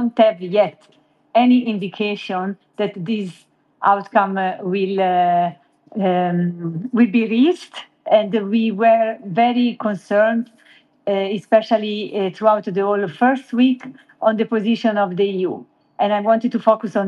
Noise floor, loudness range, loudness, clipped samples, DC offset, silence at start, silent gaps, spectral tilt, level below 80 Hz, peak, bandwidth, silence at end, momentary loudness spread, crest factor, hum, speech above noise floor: -52 dBFS; 3 LU; -18 LUFS; under 0.1%; under 0.1%; 0 s; none; -7.5 dB/octave; -74 dBFS; -2 dBFS; 8.6 kHz; 0 s; 9 LU; 18 dB; none; 34 dB